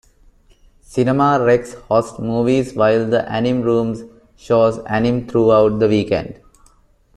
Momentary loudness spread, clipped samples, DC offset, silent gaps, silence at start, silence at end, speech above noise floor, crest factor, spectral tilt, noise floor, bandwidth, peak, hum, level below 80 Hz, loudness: 8 LU; under 0.1%; under 0.1%; none; 0.9 s; 0.85 s; 37 dB; 14 dB; -7 dB/octave; -53 dBFS; 12 kHz; -2 dBFS; none; -46 dBFS; -17 LUFS